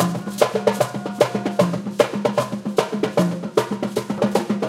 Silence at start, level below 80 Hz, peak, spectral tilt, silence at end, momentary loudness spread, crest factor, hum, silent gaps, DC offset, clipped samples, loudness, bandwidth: 0 s; -62 dBFS; 0 dBFS; -5.5 dB/octave; 0 s; 4 LU; 20 dB; none; none; under 0.1%; under 0.1%; -21 LUFS; 16.5 kHz